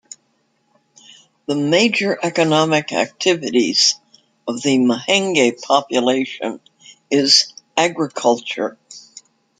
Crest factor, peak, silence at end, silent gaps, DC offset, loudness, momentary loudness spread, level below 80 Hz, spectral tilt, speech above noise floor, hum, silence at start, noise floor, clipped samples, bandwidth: 18 dB; 0 dBFS; 0.6 s; none; under 0.1%; -17 LUFS; 14 LU; -66 dBFS; -3 dB/octave; 47 dB; none; 1.5 s; -64 dBFS; under 0.1%; 9.6 kHz